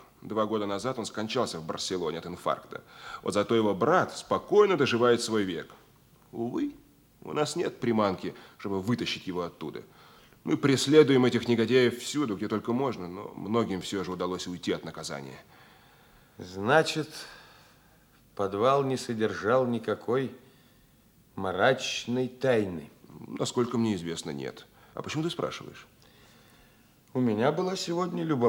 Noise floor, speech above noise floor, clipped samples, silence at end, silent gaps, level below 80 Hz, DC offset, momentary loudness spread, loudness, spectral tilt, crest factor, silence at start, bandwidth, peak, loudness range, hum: -61 dBFS; 33 dB; under 0.1%; 0 s; none; -68 dBFS; under 0.1%; 17 LU; -28 LUFS; -5 dB/octave; 22 dB; 0.25 s; 18 kHz; -6 dBFS; 7 LU; none